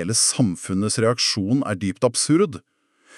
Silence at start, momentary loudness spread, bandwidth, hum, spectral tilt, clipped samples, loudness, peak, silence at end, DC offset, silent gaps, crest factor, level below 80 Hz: 0 s; 6 LU; 13.5 kHz; none; -4 dB/octave; under 0.1%; -20 LUFS; -6 dBFS; 0.6 s; under 0.1%; none; 16 dB; -62 dBFS